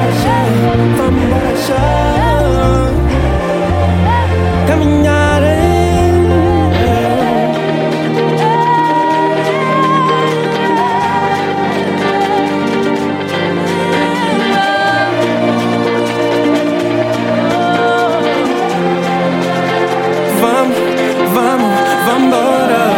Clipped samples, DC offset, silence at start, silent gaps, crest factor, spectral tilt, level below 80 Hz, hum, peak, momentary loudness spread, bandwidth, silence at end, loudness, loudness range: under 0.1%; under 0.1%; 0 s; none; 12 dB; -6 dB/octave; -26 dBFS; none; 0 dBFS; 3 LU; 17 kHz; 0 s; -12 LUFS; 2 LU